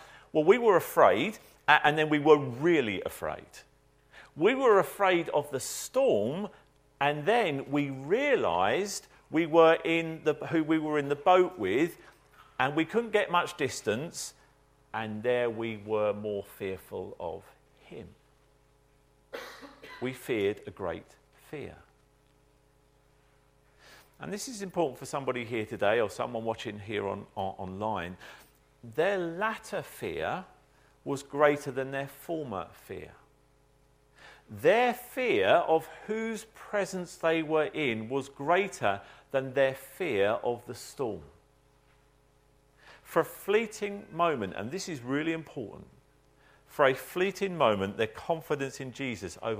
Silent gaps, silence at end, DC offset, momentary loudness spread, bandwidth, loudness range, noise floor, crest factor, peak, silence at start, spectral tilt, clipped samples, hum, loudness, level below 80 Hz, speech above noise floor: none; 0 s; under 0.1%; 17 LU; 16 kHz; 11 LU; -65 dBFS; 26 dB; -4 dBFS; 0 s; -5 dB/octave; under 0.1%; none; -29 LUFS; -66 dBFS; 36 dB